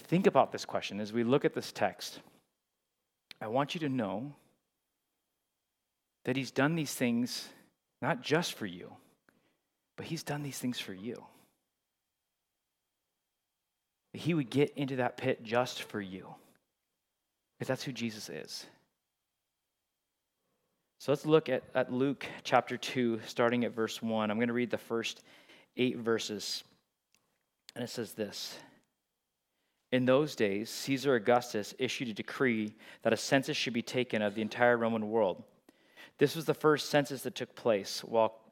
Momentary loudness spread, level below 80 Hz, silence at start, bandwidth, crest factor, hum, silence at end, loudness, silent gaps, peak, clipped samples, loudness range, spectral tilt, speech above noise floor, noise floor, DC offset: 14 LU; -84 dBFS; 0 s; 17 kHz; 24 dB; none; 0.15 s; -33 LUFS; none; -10 dBFS; under 0.1%; 11 LU; -5 dB/octave; 54 dB; -86 dBFS; under 0.1%